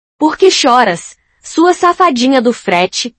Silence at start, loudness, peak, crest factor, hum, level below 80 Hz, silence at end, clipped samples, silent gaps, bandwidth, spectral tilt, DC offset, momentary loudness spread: 0.2 s; -10 LUFS; 0 dBFS; 12 dB; none; -54 dBFS; 0.1 s; 0.8%; none; 10 kHz; -3 dB/octave; under 0.1%; 6 LU